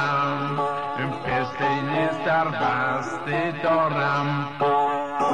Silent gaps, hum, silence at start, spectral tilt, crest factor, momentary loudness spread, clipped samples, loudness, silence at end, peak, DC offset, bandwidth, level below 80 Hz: none; none; 0 s; -6.5 dB/octave; 12 dB; 5 LU; under 0.1%; -24 LUFS; 0 s; -12 dBFS; 0.4%; 10.5 kHz; -58 dBFS